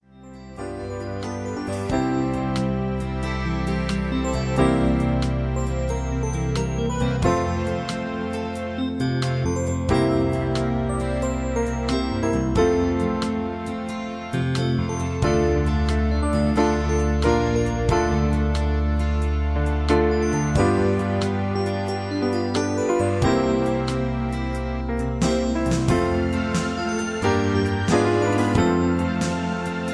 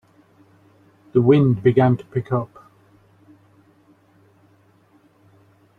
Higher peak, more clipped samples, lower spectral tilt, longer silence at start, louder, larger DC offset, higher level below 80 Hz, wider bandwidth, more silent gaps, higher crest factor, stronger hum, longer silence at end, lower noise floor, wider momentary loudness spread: second, -6 dBFS vs -2 dBFS; neither; second, -6.5 dB/octave vs -10.5 dB/octave; second, 0.15 s vs 1.15 s; second, -23 LUFS vs -18 LUFS; first, 0.1% vs under 0.1%; first, -30 dBFS vs -58 dBFS; first, 11 kHz vs 4.3 kHz; neither; about the same, 16 dB vs 20 dB; neither; second, 0 s vs 3.35 s; second, -42 dBFS vs -56 dBFS; second, 7 LU vs 10 LU